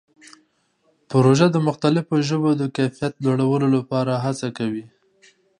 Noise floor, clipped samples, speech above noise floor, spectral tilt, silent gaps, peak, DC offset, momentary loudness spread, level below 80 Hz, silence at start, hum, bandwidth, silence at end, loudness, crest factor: -65 dBFS; under 0.1%; 45 dB; -7 dB/octave; none; -2 dBFS; under 0.1%; 9 LU; -64 dBFS; 1.1 s; none; 10.5 kHz; 0.75 s; -20 LUFS; 20 dB